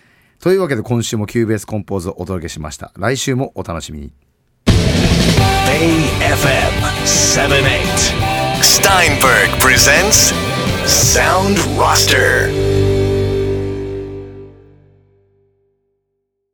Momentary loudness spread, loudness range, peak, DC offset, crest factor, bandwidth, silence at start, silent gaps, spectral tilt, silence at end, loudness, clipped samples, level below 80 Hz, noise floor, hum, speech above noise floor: 15 LU; 10 LU; 0 dBFS; under 0.1%; 14 dB; over 20 kHz; 0.45 s; none; -3.5 dB/octave; 2.05 s; -12 LUFS; under 0.1%; -28 dBFS; -71 dBFS; 50 Hz at -40 dBFS; 58 dB